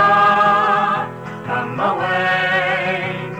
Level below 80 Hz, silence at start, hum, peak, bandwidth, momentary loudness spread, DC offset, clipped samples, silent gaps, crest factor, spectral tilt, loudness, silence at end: -56 dBFS; 0 s; none; -4 dBFS; 10.5 kHz; 11 LU; 0.1%; under 0.1%; none; 14 dB; -5.5 dB/octave; -16 LUFS; 0 s